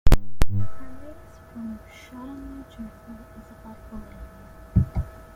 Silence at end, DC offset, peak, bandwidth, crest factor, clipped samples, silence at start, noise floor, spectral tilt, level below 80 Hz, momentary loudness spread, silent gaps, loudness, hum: 0.3 s; under 0.1%; -2 dBFS; 16.5 kHz; 20 dB; under 0.1%; 0.05 s; -45 dBFS; -7 dB/octave; -28 dBFS; 20 LU; none; -31 LUFS; none